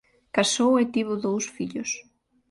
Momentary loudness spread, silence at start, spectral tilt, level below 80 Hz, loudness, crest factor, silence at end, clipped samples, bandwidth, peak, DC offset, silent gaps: 10 LU; 0.35 s; -3.5 dB/octave; -66 dBFS; -25 LUFS; 20 dB; 0.5 s; under 0.1%; 11.5 kHz; -6 dBFS; under 0.1%; none